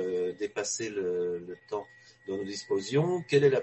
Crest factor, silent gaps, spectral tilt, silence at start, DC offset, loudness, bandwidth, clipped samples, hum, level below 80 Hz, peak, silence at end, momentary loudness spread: 18 dB; none; -5 dB/octave; 0 s; under 0.1%; -31 LUFS; 8.4 kHz; under 0.1%; none; -68 dBFS; -12 dBFS; 0 s; 12 LU